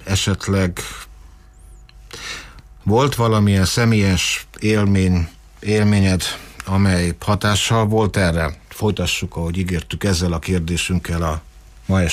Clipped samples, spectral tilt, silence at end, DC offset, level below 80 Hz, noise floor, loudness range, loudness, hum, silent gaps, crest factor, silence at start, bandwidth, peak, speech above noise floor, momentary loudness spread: under 0.1%; -5 dB/octave; 0 s; under 0.1%; -34 dBFS; -43 dBFS; 4 LU; -18 LUFS; none; none; 14 dB; 0 s; 15.5 kHz; -6 dBFS; 25 dB; 14 LU